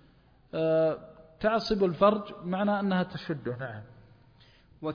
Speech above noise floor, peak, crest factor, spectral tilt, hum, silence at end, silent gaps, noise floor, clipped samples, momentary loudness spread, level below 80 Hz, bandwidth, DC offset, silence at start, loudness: 32 dB; -10 dBFS; 20 dB; -7.5 dB/octave; none; 0 s; none; -60 dBFS; under 0.1%; 14 LU; -58 dBFS; 5.2 kHz; under 0.1%; 0.55 s; -29 LUFS